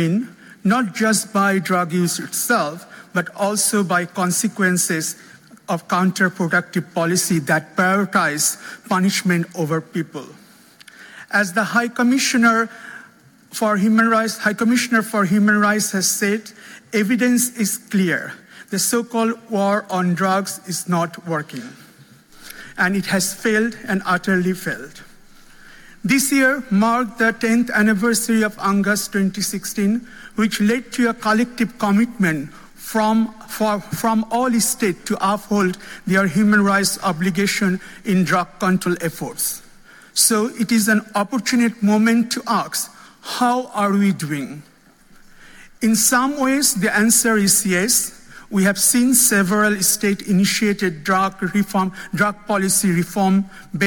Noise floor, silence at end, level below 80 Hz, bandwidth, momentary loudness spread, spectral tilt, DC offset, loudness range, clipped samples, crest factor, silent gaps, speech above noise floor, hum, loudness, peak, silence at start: -49 dBFS; 0 s; -56 dBFS; 17.5 kHz; 10 LU; -4 dB/octave; under 0.1%; 5 LU; under 0.1%; 18 dB; none; 31 dB; none; -18 LUFS; -2 dBFS; 0 s